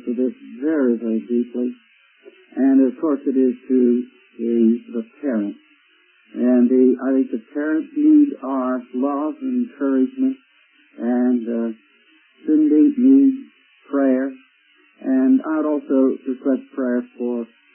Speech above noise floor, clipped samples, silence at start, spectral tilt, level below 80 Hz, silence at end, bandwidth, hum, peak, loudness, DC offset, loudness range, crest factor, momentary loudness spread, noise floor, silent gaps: 38 dB; under 0.1%; 0.05 s; -12 dB/octave; -76 dBFS; 0.3 s; 3.2 kHz; none; -4 dBFS; -19 LUFS; under 0.1%; 4 LU; 14 dB; 12 LU; -57 dBFS; none